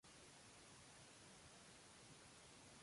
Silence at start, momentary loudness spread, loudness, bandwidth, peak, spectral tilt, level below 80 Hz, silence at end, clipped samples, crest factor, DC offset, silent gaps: 0.05 s; 0 LU; -63 LUFS; 11.5 kHz; -52 dBFS; -2.5 dB/octave; -80 dBFS; 0 s; under 0.1%; 12 dB; under 0.1%; none